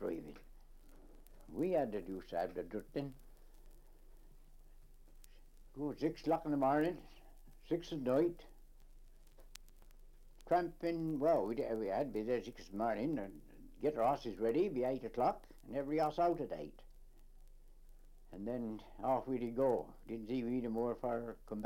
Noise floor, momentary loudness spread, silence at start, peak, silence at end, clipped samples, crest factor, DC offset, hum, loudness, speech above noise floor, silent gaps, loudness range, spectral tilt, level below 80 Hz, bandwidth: -58 dBFS; 14 LU; 0 s; -22 dBFS; 0 s; under 0.1%; 18 dB; under 0.1%; none; -38 LUFS; 21 dB; none; 6 LU; -7.5 dB/octave; -58 dBFS; 16.5 kHz